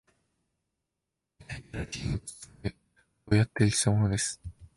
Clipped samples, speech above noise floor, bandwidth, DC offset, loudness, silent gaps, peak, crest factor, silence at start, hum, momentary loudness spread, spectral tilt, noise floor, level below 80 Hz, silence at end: under 0.1%; 58 dB; 11.5 kHz; under 0.1%; -29 LUFS; none; -12 dBFS; 20 dB; 1.4 s; none; 18 LU; -5 dB/octave; -86 dBFS; -48 dBFS; 0.1 s